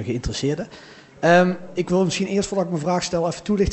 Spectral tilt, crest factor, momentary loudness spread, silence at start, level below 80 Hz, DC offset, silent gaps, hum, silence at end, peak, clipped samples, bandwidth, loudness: -5.5 dB/octave; 18 dB; 9 LU; 0 s; -40 dBFS; under 0.1%; none; none; 0 s; -4 dBFS; under 0.1%; 8.4 kHz; -21 LUFS